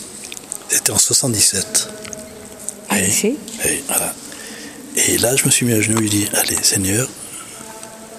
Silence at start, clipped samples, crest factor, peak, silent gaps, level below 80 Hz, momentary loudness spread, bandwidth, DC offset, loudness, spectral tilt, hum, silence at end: 0 s; under 0.1%; 18 dB; 0 dBFS; none; -52 dBFS; 18 LU; 15.5 kHz; under 0.1%; -15 LUFS; -2.5 dB/octave; none; 0 s